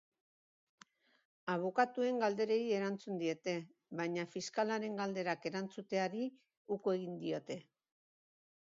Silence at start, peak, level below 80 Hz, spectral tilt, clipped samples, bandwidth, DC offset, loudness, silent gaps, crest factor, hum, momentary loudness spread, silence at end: 1.45 s; -18 dBFS; -88 dBFS; -4.5 dB/octave; under 0.1%; 7.4 kHz; under 0.1%; -38 LUFS; 6.57-6.65 s; 22 dB; none; 9 LU; 1 s